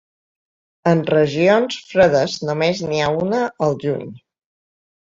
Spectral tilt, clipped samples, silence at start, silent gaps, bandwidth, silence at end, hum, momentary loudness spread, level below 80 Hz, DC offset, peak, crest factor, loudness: -6 dB/octave; under 0.1%; 0.85 s; none; 7.8 kHz; 0.95 s; none; 8 LU; -56 dBFS; under 0.1%; -2 dBFS; 18 dB; -18 LUFS